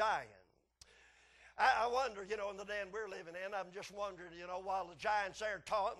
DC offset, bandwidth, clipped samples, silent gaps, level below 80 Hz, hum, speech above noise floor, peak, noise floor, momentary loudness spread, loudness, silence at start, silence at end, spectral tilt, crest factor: under 0.1%; 12.5 kHz; under 0.1%; none; -70 dBFS; none; 29 dB; -18 dBFS; -68 dBFS; 13 LU; -39 LUFS; 0 s; 0 s; -2.5 dB/octave; 22 dB